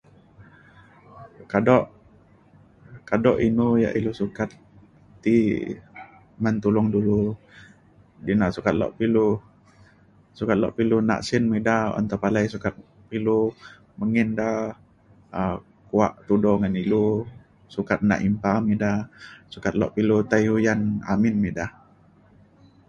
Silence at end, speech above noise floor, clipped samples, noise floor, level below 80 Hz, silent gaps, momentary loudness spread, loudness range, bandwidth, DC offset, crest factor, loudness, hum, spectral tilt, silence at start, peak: 1.2 s; 33 dB; under 0.1%; -55 dBFS; -50 dBFS; none; 12 LU; 3 LU; 7.6 kHz; under 0.1%; 20 dB; -23 LUFS; none; -7.5 dB/octave; 0.4 s; -4 dBFS